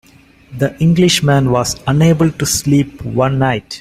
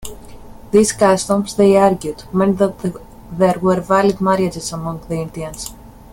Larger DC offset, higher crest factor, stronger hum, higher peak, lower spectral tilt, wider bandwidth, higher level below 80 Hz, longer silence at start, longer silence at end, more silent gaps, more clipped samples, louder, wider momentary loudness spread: neither; about the same, 14 dB vs 16 dB; neither; about the same, 0 dBFS vs 0 dBFS; about the same, -5 dB/octave vs -5.5 dB/octave; about the same, 15.5 kHz vs 17 kHz; about the same, -40 dBFS vs -42 dBFS; first, 0.5 s vs 0 s; second, 0 s vs 0.25 s; neither; neither; about the same, -14 LUFS vs -16 LUFS; second, 8 LU vs 14 LU